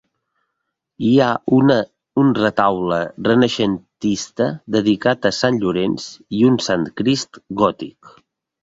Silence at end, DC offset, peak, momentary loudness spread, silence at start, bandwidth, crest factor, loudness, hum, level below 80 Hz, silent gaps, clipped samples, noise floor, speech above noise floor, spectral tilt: 0.55 s; under 0.1%; -2 dBFS; 8 LU; 1 s; 7.8 kHz; 18 dB; -18 LUFS; none; -54 dBFS; none; under 0.1%; -77 dBFS; 59 dB; -5.5 dB/octave